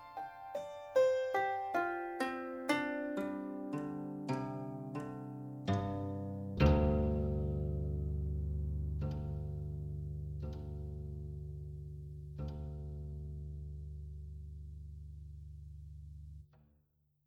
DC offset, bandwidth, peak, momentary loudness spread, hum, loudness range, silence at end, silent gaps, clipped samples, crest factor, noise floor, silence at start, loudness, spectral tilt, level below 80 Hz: under 0.1%; 12.5 kHz; -14 dBFS; 18 LU; none; 13 LU; 0.8 s; none; under 0.1%; 24 dB; -75 dBFS; 0 s; -39 LUFS; -8 dB/octave; -44 dBFS